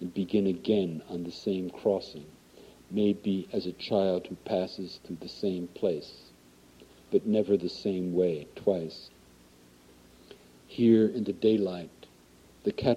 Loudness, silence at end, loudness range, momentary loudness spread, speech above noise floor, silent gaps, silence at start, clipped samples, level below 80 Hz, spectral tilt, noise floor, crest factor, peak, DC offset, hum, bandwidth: -29 LUFS; 0 s; 3 LU; 14 LU; 29 dB; none; 0 s; under 0.1%; -64 dBFS; -7.5 dB/octave; -57 dBFS; 20 dB; -10 dBFS; under 0.1%; none; 13.5 kHz